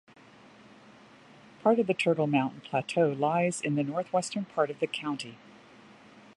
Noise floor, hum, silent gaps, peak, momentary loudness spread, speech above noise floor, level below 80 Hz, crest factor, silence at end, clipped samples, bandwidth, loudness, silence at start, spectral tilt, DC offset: -54 dBFS; none; none; -12 dBFS; 8 LU; 26 dB; -76 dBFS; 20 dB; 1 s; under 0.1%; 11.5 kHz; -29 LUFS; 1.65 s; -5.5 dB/octave; under 0.1%